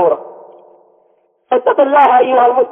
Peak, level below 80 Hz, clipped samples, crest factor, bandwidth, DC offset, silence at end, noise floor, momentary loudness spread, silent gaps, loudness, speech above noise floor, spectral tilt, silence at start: 0 dBFS; -66 dBFS; under 0.1%; 12 dB; 3.8 kHz; under 0.1%; 0 s; -56 dBFS; 8 LU; none; -11 LUFS; 46 dB; -6.5 dB/octave; 0 s